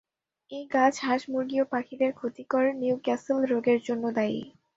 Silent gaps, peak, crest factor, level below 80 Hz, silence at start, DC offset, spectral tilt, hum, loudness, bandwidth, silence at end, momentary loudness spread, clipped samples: none; -8 dBFS; 18 dB; -72 dBFS; 0.5 s; under 0.1%; -5 dB/octave; none; -27 LUFS; 7.8 kHz; 0.3 s; 6 LU; under 0.1%